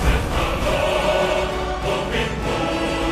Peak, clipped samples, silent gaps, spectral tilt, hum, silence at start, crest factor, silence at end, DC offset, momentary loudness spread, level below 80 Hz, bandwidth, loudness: -6 dBFS; under 0.1%; none; -5 dB/octave; none; 0 s; 14 dB; 0 s; under 0.1%; 4 LU; -28 dBFS; 14.5 kHz; -21 LUFS